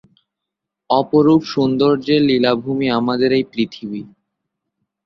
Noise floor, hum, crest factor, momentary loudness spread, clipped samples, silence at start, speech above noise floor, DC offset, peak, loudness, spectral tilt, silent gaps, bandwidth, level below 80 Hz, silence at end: -82 dBFS; none; 16 dB; 10 LU; under 0.1%; 0.9 s; 66 dB; under 0.1%; -2 dBFS; -16 LUFS; -7.5 dB/octave; none; 6.4 kHz; -56 dBFS; 1 s